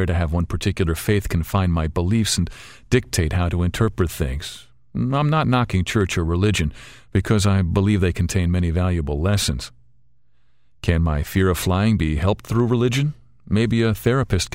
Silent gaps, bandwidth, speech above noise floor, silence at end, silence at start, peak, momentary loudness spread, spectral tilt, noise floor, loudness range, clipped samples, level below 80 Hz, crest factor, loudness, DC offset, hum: none; 16 kHz; 47 dB; 0.05 s; 0 s; -2 dBFS; 7 LU; -6 dB/octave; -66 dBFS; 2 LU; under 0.1%; -32 dBFS; 18 dB; -21 LUFS; 0.4%; none